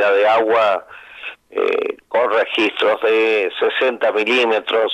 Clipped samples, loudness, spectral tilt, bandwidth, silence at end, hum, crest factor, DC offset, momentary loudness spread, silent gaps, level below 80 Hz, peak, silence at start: under 0.1%; -17 LUFS; -3.5 dB/octave; 9.4 kHz; 0 s; none; 12 dB; under 0.1%; 9 LU; none; -66 dBFS; -6 dBFS; 0 s